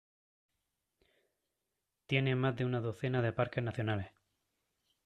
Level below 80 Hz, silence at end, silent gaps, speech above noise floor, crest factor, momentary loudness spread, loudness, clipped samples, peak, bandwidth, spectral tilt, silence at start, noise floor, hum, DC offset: -68 dBFS; 0.95 s; none; 53 dB; 20 dB; 5 LU; -35 LUFS; under 0.1%; -16 dBFS; 8.8 kHz; -8 dB/octave; 2.1 s; -87 dBFS; none; under 0.1%